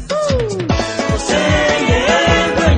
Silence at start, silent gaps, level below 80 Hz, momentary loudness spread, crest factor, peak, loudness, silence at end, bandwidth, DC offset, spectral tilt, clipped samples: 0 s; none; -26 dBFS; 6 LU; 14 dB; 0 dBFS; -14 LUFS; 0 s; 9.8 kHz; under 0.1%; -4.5 dB/octave; under 0.1%